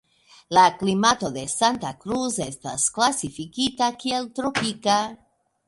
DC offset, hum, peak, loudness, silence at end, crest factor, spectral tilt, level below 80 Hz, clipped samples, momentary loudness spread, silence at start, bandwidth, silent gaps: under 0.1%; none; -2 dBFS; -23 LUFS; 0.55 s; 20 dB; -3 dB/octave; -58 dBFS; under 0.1%; 10 LU; 0.5 s; 11.5 kHz; none